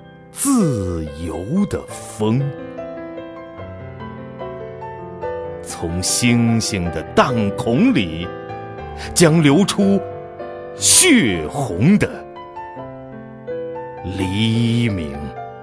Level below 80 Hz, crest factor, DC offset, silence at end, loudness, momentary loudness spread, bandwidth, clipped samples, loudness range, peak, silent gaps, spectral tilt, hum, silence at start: -42 dBFS; 18 dB; under 0.1%; 0 s; -17 LUFS; 19 LU; 11 kHz; under 0.1%; 12 LU; 0 dBFS; none; -4.5 dB/octave; none; 0 s